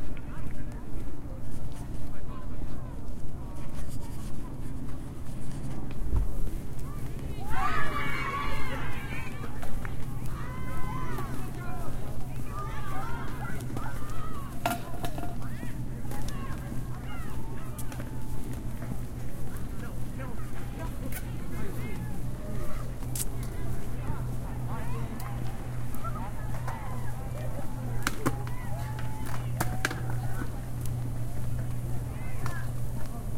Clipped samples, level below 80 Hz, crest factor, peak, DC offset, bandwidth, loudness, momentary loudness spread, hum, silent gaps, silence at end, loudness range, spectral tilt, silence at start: under 0.1%; -38 dBFS; 16 dB; -10 dBFS; under 0.1%; 16.5 kHz; -36 LUFS; 8 LU; none; none; 0 s; 6 LU; -5.5 dB/octave; 0 s